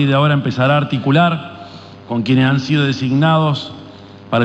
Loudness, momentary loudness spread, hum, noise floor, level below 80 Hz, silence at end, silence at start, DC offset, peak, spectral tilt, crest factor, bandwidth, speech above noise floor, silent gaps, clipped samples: -15 LUFS; 18 LU; none; -37 dBFS; -54 dBFS; 0 s; 0 s; under 0.1%; -4 dBFS; -7.5 dB/octave; 12 dB; 8 kHz; 22 dB; none; under 0.1%